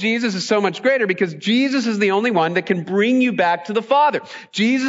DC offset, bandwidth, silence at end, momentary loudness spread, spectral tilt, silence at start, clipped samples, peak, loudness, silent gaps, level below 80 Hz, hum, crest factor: under 0.1%; 7.8 kHz; 0 s; 4 LU; -5 dB/octave; 0 s; under 0.1%; -4 dBFS; -18 LUFS; none; -72 dBFS; none; 14 dB